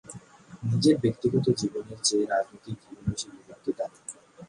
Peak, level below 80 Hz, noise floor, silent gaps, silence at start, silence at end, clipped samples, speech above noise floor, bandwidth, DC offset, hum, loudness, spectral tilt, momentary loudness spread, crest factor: -10 dBFS; -56 dBFS; -48 dBFS; none; 0.1 s; 0.05 s; under 0.1%; 21 dB; 11.5 kHz; under 0.1%; none; -28 LUFS; -5 dB/octave; 18 LU; 20 dB